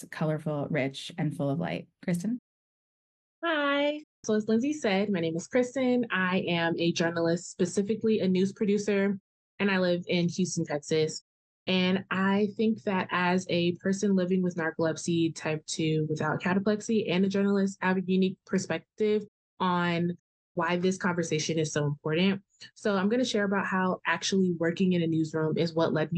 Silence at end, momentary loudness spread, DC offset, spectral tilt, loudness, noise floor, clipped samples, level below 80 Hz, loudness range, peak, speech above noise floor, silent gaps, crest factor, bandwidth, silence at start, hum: 0 s; 6 LU; under 0.1%; -5.5 dB/octave; -28 LUFS; under -90 dBFS; under 0.1%; -72 dBFS; 2 LU; -12 dBFS; over 62 dB; 2.39-3.42 s, 4.04-4.23 s, 9.20-9.58 s, 11.21-11.66 s, 19.28-19.57 s, 20.19-20.55 s; 16 dB; 10 kHz; 0 s; none